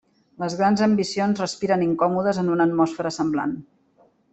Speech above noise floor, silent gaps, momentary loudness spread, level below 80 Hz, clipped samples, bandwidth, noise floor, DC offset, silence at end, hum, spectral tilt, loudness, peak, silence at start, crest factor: 38 dB; none; 8 LU; -62 dBFS; under 0.1%; 8.4 kHz; -60 dBFS; under 0.1%; 0.7 s; none; -6 dB/octave; -22 LUFS; -6 dBFS; 0.4 s; 16 dB